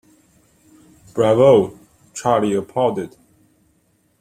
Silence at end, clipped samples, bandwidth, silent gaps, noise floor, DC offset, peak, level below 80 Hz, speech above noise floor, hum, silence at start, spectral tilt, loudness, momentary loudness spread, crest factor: 1.15 s; under 0.1%; 14 kHz; none; -62 dBFS; under 0.1%; -2 dBFS; -56 dBFS; 46 dB; none; 1.15 s; -6.5 dB/octave; -17 LUFS; 18 LU; 18 dB